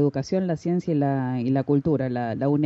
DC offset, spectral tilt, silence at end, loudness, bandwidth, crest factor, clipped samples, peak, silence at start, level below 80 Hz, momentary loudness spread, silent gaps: under 0.1%; -8.5 dB/octave; 0 s; -24 LUFS; 7.6 kHz; 12 dB; under 0.1%; -10 dBFS; 0 s; -58 dBFS; 3 LU; none